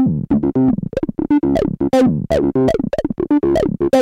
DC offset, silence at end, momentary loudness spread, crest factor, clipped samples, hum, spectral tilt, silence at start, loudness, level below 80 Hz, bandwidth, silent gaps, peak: under 0.1%; 0 s; 6 LU; 14 dB; under 0.1%; none; -8 dB/octave; 0 s; -16 LUFS; -36 dBFS; 12 kHz; none; 0 dBFS